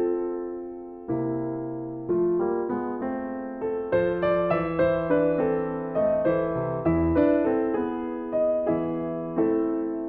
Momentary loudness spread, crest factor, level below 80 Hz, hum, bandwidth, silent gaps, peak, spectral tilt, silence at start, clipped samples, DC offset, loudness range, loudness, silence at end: 9 LU; 16 dB; -48 dBFS; none; 4.5 kHz; none; -8 dBFS; -11.5 dB/octave; 0 s; under 0.1%; under 0.1%; 5 LU; -26 LUFS; 0 s